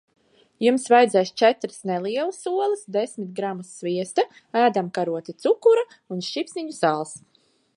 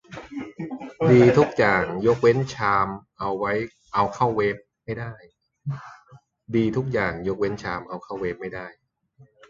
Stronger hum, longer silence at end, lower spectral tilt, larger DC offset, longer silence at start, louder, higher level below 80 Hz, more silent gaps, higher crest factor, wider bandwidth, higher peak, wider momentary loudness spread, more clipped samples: neither; second, 0.6 s vs 0.8 s; second, -4.5 dB/octave vs -7.5 dB/octave; neither; first, 0.6 s vs 0.1 s; about the same, -23 LUFS vs -23 LUFS; second, -78 dBFS vs -52 dBFS; neither; about the same, 18 dB vs 20 dB; first, 11 kHz vs 7.4 kHz; about the same, -4 dBFS vs -4 dBFS; second, 12 LU vs 17 LU; neither